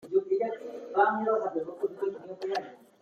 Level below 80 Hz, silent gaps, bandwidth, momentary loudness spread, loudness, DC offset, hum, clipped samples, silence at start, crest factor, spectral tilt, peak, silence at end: -82 dBFS; none; 7 kHz; 11 LU; -30 LUFS; under 0.1%; none; under 0.1%; 0 s; 18 dB; -6 dB/octave; -12 dBFS; 0.25 s